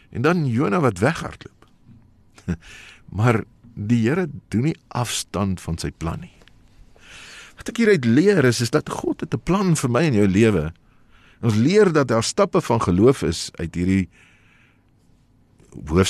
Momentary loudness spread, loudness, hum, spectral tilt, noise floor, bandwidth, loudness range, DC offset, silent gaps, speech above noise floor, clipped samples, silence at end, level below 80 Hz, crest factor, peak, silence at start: 18 LU; -20 LUFS; none; -6 dB/octave; -57 dBFS; 13 kHz; 6 LU; under 0.1%; none; 37 dB; under 0.1%; 0 s; -44 dBFS; 18 dB; -4 dBFS; 0.1 s